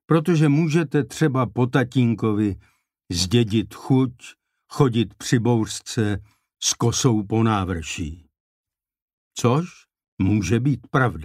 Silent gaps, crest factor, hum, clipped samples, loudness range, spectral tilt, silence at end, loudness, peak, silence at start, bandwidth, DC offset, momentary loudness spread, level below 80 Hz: 8.40-8.64 s, 9.02-9.31 s, 10.08-10.17 s; 18 dB; none; under 0.1%; 4 LU; -5.5 dB/octave; 0 s; -21 LUFS; -4 dBFS; 0.1 s; 15 kHz; under 0.1%; 8 LU; -48 dBFS